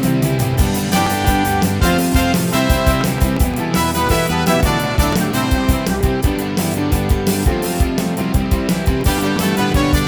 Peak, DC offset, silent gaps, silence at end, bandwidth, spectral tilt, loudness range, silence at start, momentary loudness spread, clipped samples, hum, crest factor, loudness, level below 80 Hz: 0 dBFS; under 0.1%; none; 0 s; over 20 kHz; -5 dB/octave; 2 LU; 0 s; 3 LU; under 0.1%; none; 16 dB; -16 LUFS; -22 dBFS